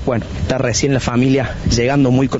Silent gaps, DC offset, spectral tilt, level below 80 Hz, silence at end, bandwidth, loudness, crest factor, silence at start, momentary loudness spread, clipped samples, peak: none; under 0.1%; -6 dB/octave; -30 dBFS; 0 s; 8 kHz; -16 LUFS; 12 dB; 0 s; 7 LU; under 0.1%; -4 dBFS